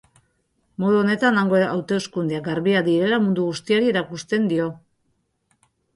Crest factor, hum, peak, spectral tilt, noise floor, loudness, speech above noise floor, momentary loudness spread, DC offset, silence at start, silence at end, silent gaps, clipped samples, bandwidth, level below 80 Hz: 16 dB; none; -6 dBFS; -6 dB/octave; -70 dBFS; -21 LUFS; 50 dB; 7 LU; under 0.1%; 0.8 s; 1.2 s; none; under 0.1%; 11.5 kHz; -62 dBFS